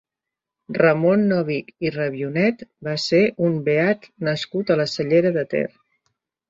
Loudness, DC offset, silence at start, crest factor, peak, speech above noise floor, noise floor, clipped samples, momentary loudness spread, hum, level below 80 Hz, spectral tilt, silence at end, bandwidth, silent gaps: -21 LUFS; under 0.1%; 0.7 s; 18 dB; -2 dBFS; 66 dB; -86 dBFS; under 0.1%; 8 LU; none; -62 dBFS; -6.5 dB/octave; 0.8 s; 7.8 kHz; none